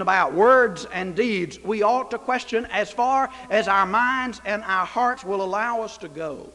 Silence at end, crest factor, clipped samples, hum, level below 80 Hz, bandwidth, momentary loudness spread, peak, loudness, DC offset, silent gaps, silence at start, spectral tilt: 0.05 s; 18 dB; under 0.1%; none; -56 dBFS; 11.5 kHz; 10 LU; -4 dBFS; -22 LUFS; under 0.1%; none; 0 s; -4.5 dB/octave